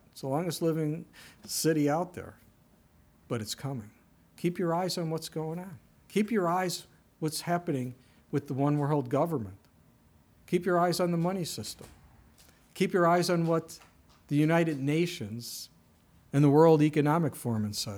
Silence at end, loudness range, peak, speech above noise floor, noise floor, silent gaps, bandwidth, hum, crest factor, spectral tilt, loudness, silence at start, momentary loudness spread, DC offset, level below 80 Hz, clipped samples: 0 s; 7 LU; -10 dBFS; 34 dB; -62 dBFS; none; 20 kHz; none; 20 dB; -6 dB/octave; -29 LUFS; 0.15 s; 16 LU; under 0.1%; -68 dBFS; under 0.1%